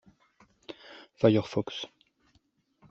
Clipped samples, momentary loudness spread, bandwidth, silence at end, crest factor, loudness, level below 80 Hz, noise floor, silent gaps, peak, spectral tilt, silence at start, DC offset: under 0.1%; 23 LU; 7.6 kHz; 1.05 s; 24 dB; -28 LUFS; -68 dBFS; -70 dBFS; none; -8 dBFS; -7 dB/octave; 0.7 s; under 0.1%